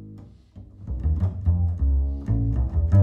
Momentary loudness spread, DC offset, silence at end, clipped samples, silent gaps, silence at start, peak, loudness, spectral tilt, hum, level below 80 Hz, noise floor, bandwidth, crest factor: 11 LU; under 0.1%; 0 s; under 0.1%; none; 0 s; -8 dBFS; -25 LUFS; -11.5 dB/octave; none; -26 dBFS; -45 dBFS; 2.2 kHz; 16 dB